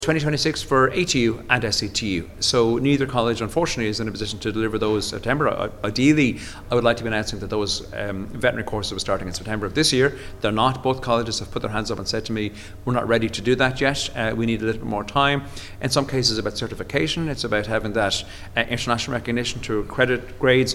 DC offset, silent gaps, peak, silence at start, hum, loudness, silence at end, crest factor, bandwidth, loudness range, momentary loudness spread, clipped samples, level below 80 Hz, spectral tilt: under 0.1%; none; 0 dBFS; 0 s; none; -22 LUFS; 0 s; 22 dB; 16.5 kHz; 3 LU; 8 LU; under 0.1%; -40 dBFS; -4.5 dB/octave